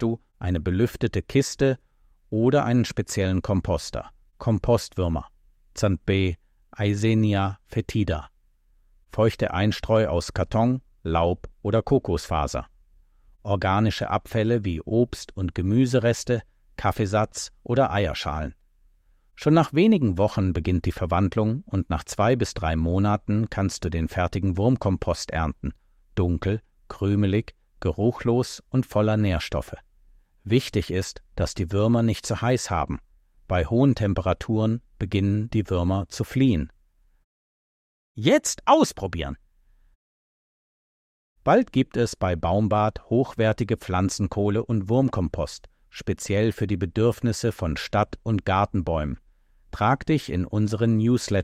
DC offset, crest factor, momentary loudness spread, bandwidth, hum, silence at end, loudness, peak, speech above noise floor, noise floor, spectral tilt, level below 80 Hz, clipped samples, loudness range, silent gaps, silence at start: under 0.1%; 20 dB; 10 LU; 14.5 kHz; none; 0 s; -24 LUFS; -4 dBFS; 38 dB; -61 dBFS; -6.5 dB/octave; -40 dBFS; under 0.1%; 3 LU; 37.24-38.15 s, 39.95-41.36 s; 0 s